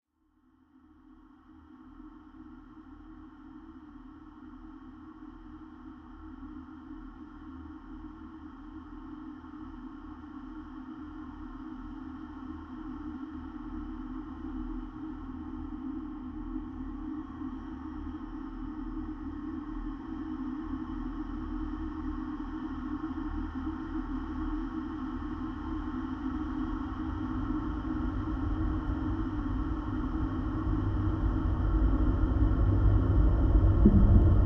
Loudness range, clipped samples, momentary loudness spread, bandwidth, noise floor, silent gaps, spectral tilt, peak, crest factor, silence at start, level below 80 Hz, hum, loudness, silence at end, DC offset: 19 LU; under 0.1%; 21 LU; 5.6 kHz; -69 dBFS; none; -10.5 dB/octave; -8 dBFS; 24 dB; 1.1 s; -36 dBFS; none; -33 LUFS; 0 s; under 0.1%